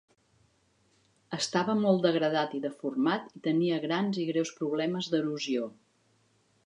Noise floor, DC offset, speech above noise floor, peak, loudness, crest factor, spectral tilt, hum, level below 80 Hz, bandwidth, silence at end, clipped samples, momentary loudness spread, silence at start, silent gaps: -69 dBFS; under 0.1%; 40 dB; -12 dBFS; -30 LUFS; 20 dB; -5.5 dB/octave; none; -80 dBFS; 10.5 kHz; 0.9 s; under 0.1%; 8 LU; 1.3 s; none